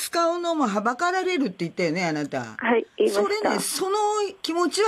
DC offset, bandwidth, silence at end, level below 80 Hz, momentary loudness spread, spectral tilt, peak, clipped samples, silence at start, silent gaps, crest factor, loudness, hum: under 0.1%; 15.5 kHz; 0 s; -70 dBFS; 4 LU; -4 dB/octave; -10 dBFS; under 0.1%; 0 s; none; 14 dB; -24 LUFS; none